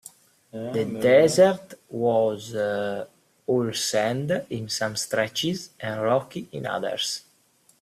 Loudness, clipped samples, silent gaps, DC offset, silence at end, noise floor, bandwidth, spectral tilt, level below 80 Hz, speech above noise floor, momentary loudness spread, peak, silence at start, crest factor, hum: -24 LUFS; under 0.1%; none; under 0.1%; 0.6 s; -62 dBFS; 15 kHz; -4 dB/octave; -66 dBFS; 38 dB; 16 LU; -6 dBFS; 0.05 s; 20 dB; none